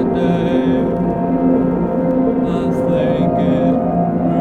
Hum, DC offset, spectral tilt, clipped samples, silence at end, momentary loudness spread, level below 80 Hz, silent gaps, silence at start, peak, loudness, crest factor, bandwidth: none; under 0.1%; -9.5 dB/octave; under 0.1%; 0 s; 2 LU; -38 dBFS; none; 0 s; -4 dBFS; -16 LUFS; 12 dB; 6.2 kHz